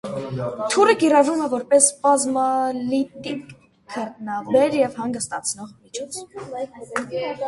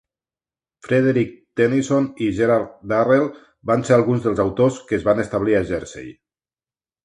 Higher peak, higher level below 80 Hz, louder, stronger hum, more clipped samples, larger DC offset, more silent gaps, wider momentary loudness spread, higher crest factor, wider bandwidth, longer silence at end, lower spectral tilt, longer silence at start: about the same, -2 dBFS vs -2 dBFS; second, -62 dBFS vs -50 dBFS; about the same, -21 LUFS vs -19 LUFS; neither; neither; neither; neither; first, 17 LU vs 10 LU; about the same, 20 dB vs 18 dB; about the same, 11.5 kHz vs 11 kHz; second, 0 s vs 0.9 s; second, -3.5 dB/octave vs -7 dB/octave; second, 0.05 s vs 0.85 s